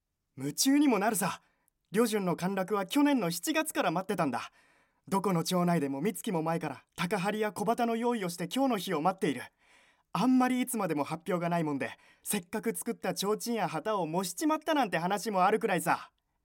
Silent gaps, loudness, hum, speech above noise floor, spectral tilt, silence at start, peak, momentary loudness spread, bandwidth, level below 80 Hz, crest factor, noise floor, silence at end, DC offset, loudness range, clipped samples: none; -31 LUFS; none; 35 dB; -4.5 dB/octave; 0.35 s; -12 dBFS; 8 LU; 17 kHz; -76 dBFS; 18 dB; -65 dBFS; 0.45 s; under 0.1%; 3 LU; under 0.1%